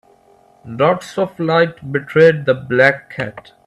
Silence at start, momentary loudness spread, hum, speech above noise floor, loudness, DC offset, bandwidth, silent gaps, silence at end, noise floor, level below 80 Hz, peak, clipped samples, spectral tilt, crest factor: 0.65 s; 14 LU; none; 35 dB; -16 LUFS; under 0.1%; 11.5 kHz; none; 0.25 s; -51 dBFS; -58 dBFS; 0 dBFS; under 0.1%; -6.5 dB/octave; 16 dB